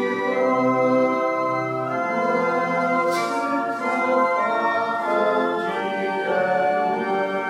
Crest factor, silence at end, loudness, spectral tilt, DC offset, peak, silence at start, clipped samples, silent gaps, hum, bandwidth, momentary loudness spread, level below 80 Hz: 14 dB; 0 s; -21 LUFS; -5.5 dB/octave; under 0.1%; -8 dBFS; 0 s; under 0.1%; none; none; 14.5 kHz; 5 LU; -80 dBFS